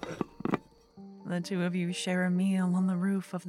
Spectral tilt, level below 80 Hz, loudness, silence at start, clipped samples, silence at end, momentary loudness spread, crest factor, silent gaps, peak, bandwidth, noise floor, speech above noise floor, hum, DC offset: -6.5 dB/octave; -68 dBFS; -31 LUFS; 0 s; under 0.1%; 0 s; 9 LU; 18 dB; none; -14 dBFS; 12 kHz; -52 dBFS; 23 dB; none; under 0.1%